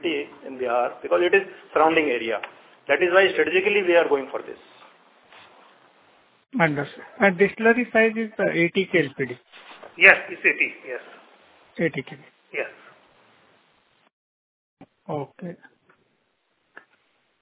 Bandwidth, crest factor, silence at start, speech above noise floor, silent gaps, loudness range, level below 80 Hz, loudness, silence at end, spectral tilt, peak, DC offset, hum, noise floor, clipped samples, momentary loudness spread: 4 kHz; 24 dB; 0.05 s; 48 dB; 14.13-14.77 s; 20 LU; -68 dBFS; -21 LUFS; 1.85 s; -8.5 dB/octave; 0 dBFS; under 0.1%; none; -70 dBFS; under 0.1%; 19 LU